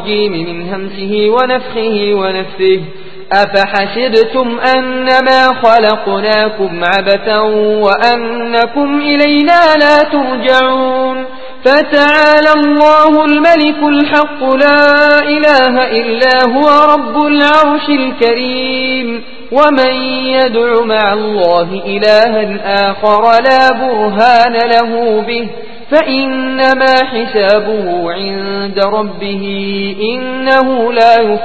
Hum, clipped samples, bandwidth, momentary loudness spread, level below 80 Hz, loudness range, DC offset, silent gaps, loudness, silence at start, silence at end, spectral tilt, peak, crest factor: none; 0.9%; 8 kHz; 9 LU; -48 dBFS; 5 LU; 5%; none; -10 LUFS; 0 s; 0 s; -5.5 dB/octave; 0 dBFS; 10 dB